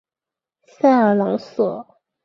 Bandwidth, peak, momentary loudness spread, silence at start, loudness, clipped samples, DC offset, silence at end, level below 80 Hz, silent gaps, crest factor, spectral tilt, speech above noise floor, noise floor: 7 kHz; -4 dBFS; 8 LU; 0.85 s; -18 LUFS; under 0.1%; under 0.1%; 0.4 s; -68 dBFS; none; 16 dB; -8 dB/octave; 72 dB; -89 dBFS